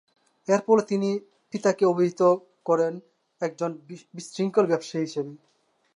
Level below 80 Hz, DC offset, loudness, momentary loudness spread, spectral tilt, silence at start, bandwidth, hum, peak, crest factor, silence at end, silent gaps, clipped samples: -80 dBFS; under 0.1%; -25 LUFS; 17 LU; -6 dB/octave; 0.5 s; 11 kHz; none; -8 dBFS; 18 dB; 0.6 s; none; under 0.1%